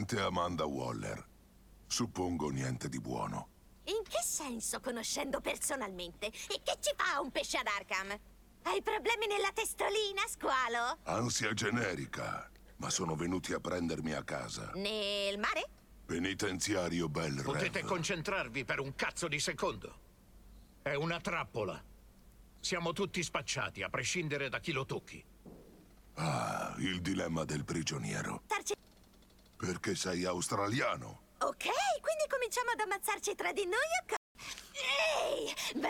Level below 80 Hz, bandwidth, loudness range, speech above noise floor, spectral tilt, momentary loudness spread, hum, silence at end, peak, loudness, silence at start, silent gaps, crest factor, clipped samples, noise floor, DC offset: -60 dBFS; 18 kHz; 4 LU; 26 dB; -3.5 dB/octave; 9 LU; none; 0 s; -18 dBFS; -36 LUFS; 0 s; 34.17-34.35 s; 18 dB; under 0.1%; -62 dBFS; under 0.1%